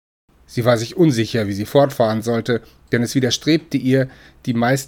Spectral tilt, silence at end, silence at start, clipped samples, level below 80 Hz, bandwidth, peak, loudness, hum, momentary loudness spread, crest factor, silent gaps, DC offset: -5.5 dB/octave; 0 s; 0.5 s; under 0.1%; -52 dBFS; 18.5 kHz; -2 dBFS; -19 LUFS; none; 8 LU; 18 dB; none; under 0.1%